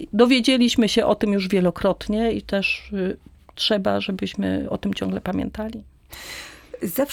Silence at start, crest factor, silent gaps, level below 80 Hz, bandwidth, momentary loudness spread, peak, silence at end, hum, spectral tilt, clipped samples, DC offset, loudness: 0 s; 18 dB; none; -46 dBFS; 18 kHz; 18 LU; -4 dBFS; 0 s; none; -5 dB/octave; under 0.1%; under 0.1%; -22 LUFS